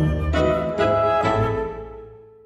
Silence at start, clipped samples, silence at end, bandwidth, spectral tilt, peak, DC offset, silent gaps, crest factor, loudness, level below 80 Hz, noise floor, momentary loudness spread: 0 s; under 0.1%; 0.25 s; 10.5 kHz; -7.5 dB/octave; -6 dBFS; under 0.1%; none; 14 dB; -21 LUFS; -32 dBFS; -42 dBFS; 17 LU